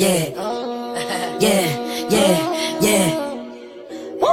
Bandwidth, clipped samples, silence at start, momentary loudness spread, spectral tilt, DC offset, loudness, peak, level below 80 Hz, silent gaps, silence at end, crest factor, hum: 16.5 kHz; under 0.1%; 0 s; 16 LU; -4 dB/octave; under 0.1%; -19 LUFS; -2 dBFS; -52 dBFS; none; 0 s; 16 dB; none